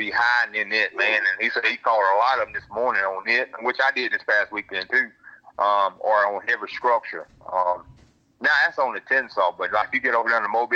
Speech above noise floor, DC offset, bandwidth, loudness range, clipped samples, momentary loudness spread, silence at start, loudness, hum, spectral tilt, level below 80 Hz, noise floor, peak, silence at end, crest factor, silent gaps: 33 dB; under 0.1%; 7.8 kHz; 2 LU; under 0.1%; 7 LU; 0 s; -22 LUFS; none; -3 dB/octave; -64 dBFS; -55 dBFS; -8 dBFS; 0 s; 16 dB; none